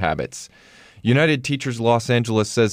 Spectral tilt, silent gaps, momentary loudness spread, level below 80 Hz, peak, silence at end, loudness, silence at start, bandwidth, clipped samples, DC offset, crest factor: -5.5 dB/octave; none; 13 LU; -52 dBFS; -6 dBFS; 0 s; -20 LUFS; 0 s; 15.5 kHz; under 0.1%; under 0.1%; 16 dB